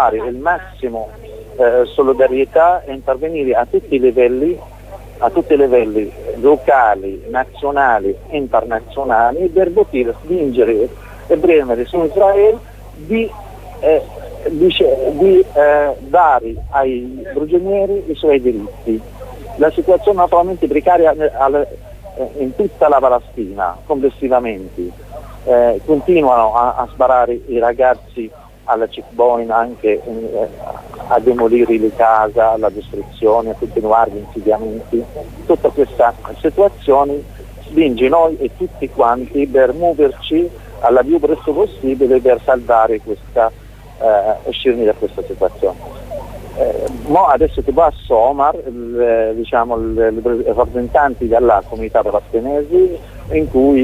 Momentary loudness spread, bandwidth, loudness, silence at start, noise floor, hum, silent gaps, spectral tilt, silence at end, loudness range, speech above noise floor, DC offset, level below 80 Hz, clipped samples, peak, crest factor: 12 LU; 15 kHz; -14 LUFS; 0 s; -33 dBFS; 50 Hz at -35 dBFS; none; -7 dB/octave; 0 s; 3 LU; 19 dB; under 0.1%; -36 dBFS; under 0.1%; 0 dBFS; 14 dB